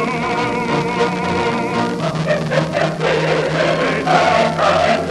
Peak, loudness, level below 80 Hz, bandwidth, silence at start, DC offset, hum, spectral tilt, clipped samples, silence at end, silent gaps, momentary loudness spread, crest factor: -2 dBFS; -17 LUFS; -44 dBFS; 12 kHz; 0 s; under 0.1%; none; -5.5 dB/octave; under 0.1%; 0 s; none; 5 LU; 14 dB